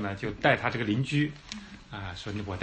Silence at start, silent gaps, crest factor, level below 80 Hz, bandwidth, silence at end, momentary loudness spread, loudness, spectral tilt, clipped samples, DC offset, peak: 0 s; none; 22 dB; -52 dBFS; 8.8 kHz; 0 s; 17 LU; -29 LUFS; -6 dB/octave; under 0.1%; under 0.1%; -8 dBFS